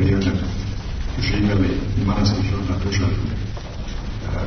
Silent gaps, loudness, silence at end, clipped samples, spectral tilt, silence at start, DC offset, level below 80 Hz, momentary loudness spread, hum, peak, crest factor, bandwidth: none; -22 LUFS; 0 s; under 0.1%; -6.5 dB/octave; 0 s; under 0.1%; -28 dBFS; 11 LU; none; -6 dBFS; 16 dB; 6.6 kHz